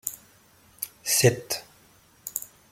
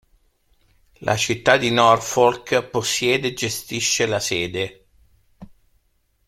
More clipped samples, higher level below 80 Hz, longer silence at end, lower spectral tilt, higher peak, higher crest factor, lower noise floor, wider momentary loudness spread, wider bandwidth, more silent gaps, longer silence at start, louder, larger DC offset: neither; second, -62 dBFS vs -54 dBFS; second, 0.25 s vs 0.8 s; about the same, -3 dB/octave vs -3 dB/octave; second, -6 dBFS vs 0 dBFS; about the same, 24 dB vs 22 dB; second, -58 dBFS vs -66 dBFS; first, 17 LU vs 10 LU; about the same, 16.5 kHz vs 16 kHz; neither; second, 0.05 s vs 1 s; second, -26 LUFS vs -20 LUFS; neither